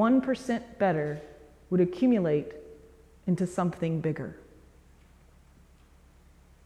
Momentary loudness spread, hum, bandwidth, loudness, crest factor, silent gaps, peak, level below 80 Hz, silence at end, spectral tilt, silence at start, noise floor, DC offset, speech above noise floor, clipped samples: 17 LU; none; 11.5 kHz; -28 LUFS; 16 dB; none; -14 dBFS; -58 dBFS; 2.3 s; -8 dB/octave; 0 s; -57 dBFS; under 0.1%; 30 dB; under 0.1%